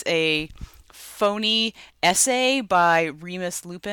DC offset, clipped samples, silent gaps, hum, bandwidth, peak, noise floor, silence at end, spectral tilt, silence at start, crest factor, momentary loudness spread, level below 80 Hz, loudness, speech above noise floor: under 0.1%; under 0.1%; none; none; 19.5 kHz; -8 dBFS; -45 dBFS; 0 s; -2 dB/octave; 0 s; 16 dB; 12 LU; -52 dBFS; -21 LUFS; 23 dB